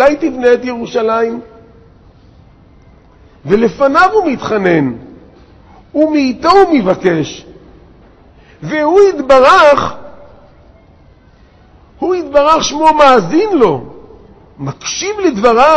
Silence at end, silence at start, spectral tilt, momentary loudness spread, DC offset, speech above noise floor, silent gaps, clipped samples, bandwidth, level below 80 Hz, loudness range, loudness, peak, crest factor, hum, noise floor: 0 s; 0 s; -5 dB/octave; 14 LU; under 0.1%; 34 dB; none; 0.3%; 8.8 kHz; -42 dBFS; 4 LU; -11 LUFS; 0 dBFS; 12 dB; none; -44 dBFS